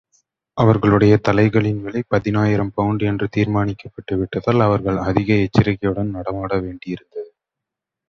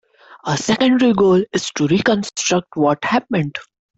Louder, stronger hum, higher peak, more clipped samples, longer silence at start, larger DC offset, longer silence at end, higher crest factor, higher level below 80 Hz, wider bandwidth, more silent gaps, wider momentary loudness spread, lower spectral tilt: about the same, -18 LUFS vs -17 LUFS; neither; first, 0 dBFS vs -4 dBFS; neither; about the same, 0.55 s vs 0.45 s; neither; first, 0.85 s vs 0.35 s; about the same, 18 dB vs 14 dB; first, -42 dBFS vs -54 dBFS; second, 6.6 kHz vs 8.2 kHz; neither; first, 15 LU vs 9 LU; first, -8.5 dB/octave vs -4.5 dB/octave